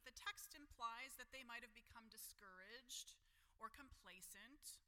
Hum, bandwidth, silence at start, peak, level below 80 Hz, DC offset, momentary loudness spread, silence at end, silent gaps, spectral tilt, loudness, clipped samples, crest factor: none; 17.5 kHz; 0 s; -36 dBFS; -76 dBFS; under 0.1%; 10 LU; 0.05 s; none; -0.5 dB/octave; -57 LUFS; under 0.1%; 22 dB